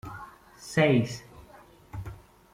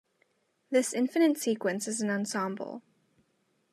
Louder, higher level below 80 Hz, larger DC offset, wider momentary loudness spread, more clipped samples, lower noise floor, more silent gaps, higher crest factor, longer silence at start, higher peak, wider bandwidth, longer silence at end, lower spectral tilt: first, -25 LUFS vs -29 LUFS; first, -54 dBFS vs -88 dBFS; neither; first, 22 LU vs 12 LU; neither; second, -53 dBFS vs -74 dBFS; neither; about the same, 20 dB vs 18 dB; second, 0.05 s vs 0.7 s; first, -10 dBFS vs -14 dBFS; first, 16 kHz vs 14 kHz; second, 0.4 s vs 0.95 s; first, -6 dB/octave vs -4 dB/octave